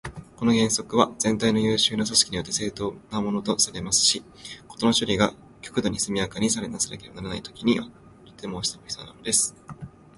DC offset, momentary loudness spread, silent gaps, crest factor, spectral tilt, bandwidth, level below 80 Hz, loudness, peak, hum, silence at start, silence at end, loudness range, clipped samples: under 0.1%; 17 LU; none; 24 dB; -3 dB/octave; 12 kHz; -52 dBFS; -24 LUFS; -2 dBFS; none; 0.05 s; 0.3 s; 5 LU; under 0.1%